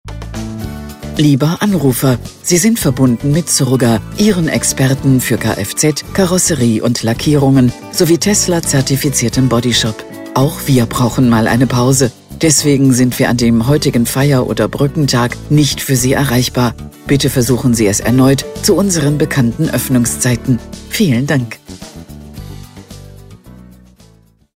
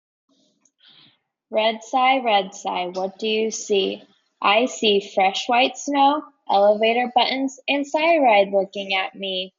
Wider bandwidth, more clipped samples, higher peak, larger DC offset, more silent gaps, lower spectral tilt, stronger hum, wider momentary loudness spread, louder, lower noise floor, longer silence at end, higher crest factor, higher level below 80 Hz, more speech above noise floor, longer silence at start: first, 16.5 kHz vs 7.6 kHz; neither; first, 0 dBFS vs -4 dBFS; neither; neither; first, -5 dB/octave vs -3 dB/octave; neither; about the same, 11 LU vs 9 LU; first, -12 LUFS vs -20 LUFS; second, -47 dBFS vs -63 dBFS; first, 0.95 s vs 0.1 s; about the same, 12 dB vs 16 dB; first, -34 dBFS vs -76 dBFS; second, 35 dB vs 43 dB; second, 0.05 s vs 1.5 s